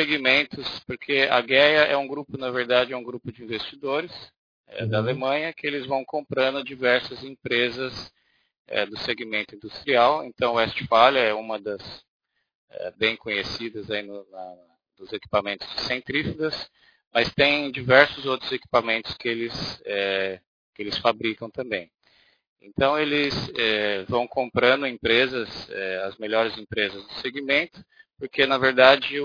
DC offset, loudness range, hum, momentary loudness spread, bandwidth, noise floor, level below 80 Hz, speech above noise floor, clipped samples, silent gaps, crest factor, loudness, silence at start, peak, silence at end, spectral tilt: under 0.1%; 7 LU; none; 17 LU; 5.4 kHz; -62 dBFS; -56 dBFS; 38 dB; under 0.1%; 4.38-4.64 s, 8.59-8.65 s, 12.08-12.20 s, 12.55-12.68 s, 17.07-17.11 s, 20.47-20.73 s, 22.47-22.56 s; 24 dB; -23 LUFS; 0 s; 0 dBFS; 0 s; -5.5 dB/octave